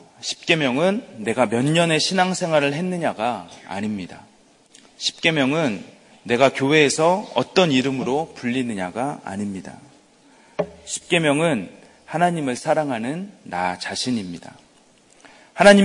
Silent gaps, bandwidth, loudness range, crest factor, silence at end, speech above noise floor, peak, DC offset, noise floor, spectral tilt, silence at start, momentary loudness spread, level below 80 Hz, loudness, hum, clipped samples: none; 11 kHz; 6 LU; 22 dB; 0 s; 34 dB; 0 dBFS; under 0.1%; -54 dBFS; -4.5 dB/octave; 0.2 s; 14 LU; -60 dBFS; -21 LUFS; none; under 0.1%